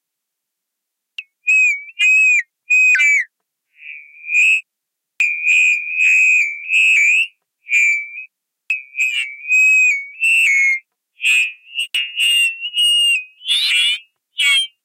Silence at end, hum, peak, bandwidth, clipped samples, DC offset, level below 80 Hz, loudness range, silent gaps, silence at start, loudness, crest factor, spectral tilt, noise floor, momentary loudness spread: 0.15 s; none; -4 dBFS; 16 kHz; under 0.1%; under 0.1%; -84 dBFS; 2 LU; none; 1.2 s; -13 LUFS; 12 dB; 7.5 dB/octave; -79 dBFS; 13 LU